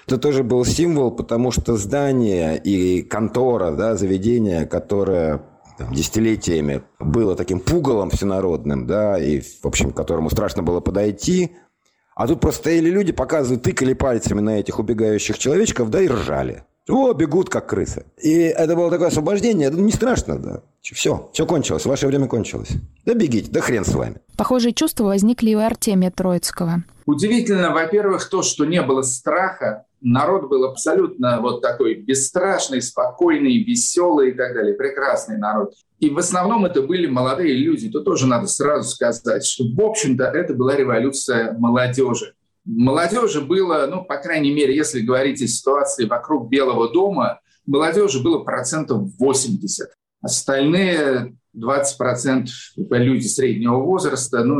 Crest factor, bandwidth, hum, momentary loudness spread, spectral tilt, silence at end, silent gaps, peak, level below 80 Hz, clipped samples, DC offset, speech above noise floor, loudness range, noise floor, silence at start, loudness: 12 dB; 16 kHz; none; 6 LU; -5 dB/octave; 0 s; none; -6 dBFS; -40 dBFS; under 0.1%; under 0.1%; 44 dB; 2 LU; -63 dBFS; 0.1 s; -19 LUFS